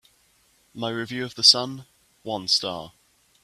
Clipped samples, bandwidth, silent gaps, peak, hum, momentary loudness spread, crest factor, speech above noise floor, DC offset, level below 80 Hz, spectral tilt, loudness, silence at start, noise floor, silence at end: under 0.1%; 14.5 kHz; none; -2 dBFS; none; 21 LU; 24 dB; 38 dB; under 0.1%; -68 dBFS; -2 dB/octave; -21 LUFS; 0.75 s; -63 dBFS; 0.55 s